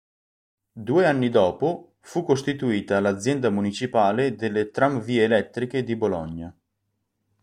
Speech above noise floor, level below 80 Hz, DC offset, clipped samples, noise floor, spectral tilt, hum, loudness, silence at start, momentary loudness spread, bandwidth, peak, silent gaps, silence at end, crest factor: 54 dB; -58 dBFS; under 0.1%; under 0.1%; -77 dBFS; -6 dB/octave; none; -23 LUFS; 0.75 s; 10 LU; 11.5 kHz; -6 dBFS; none; 0.9 s; 18 dB